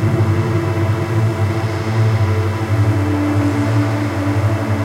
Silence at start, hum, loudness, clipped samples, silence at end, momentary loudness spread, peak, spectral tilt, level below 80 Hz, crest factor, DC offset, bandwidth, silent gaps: 0 s; none; -17 LUFS; under 0.1%; 0 s; 3 LU; -4 dBFS; -7.5 dB/octave; -46 dBFS; 10 dB; under 0.1%; 13 kHz; none